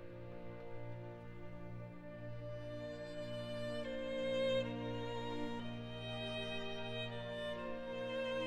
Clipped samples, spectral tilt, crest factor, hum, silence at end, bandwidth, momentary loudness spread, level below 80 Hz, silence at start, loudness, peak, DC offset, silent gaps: under 0.1%; -6 dB/octave; 16 dB; 60 Hz at -85 dBFS; 0 s; 11.5 kHz; 12 LU; -62 dBFS; 0 s; -44 LUFS; -26 dBFS; under 0.1%; none